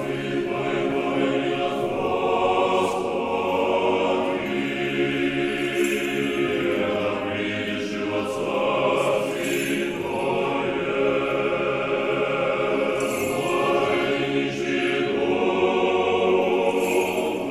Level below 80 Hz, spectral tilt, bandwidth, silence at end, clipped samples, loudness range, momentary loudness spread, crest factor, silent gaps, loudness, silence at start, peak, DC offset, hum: -54 dBFS; -5 dB/octave; 14 kHz; 0 s; under 0.1%; 2 LU; 5 LU; 14 dB; none; -23 LUFS; 0 s; -10 dBFS; under 0.1%; none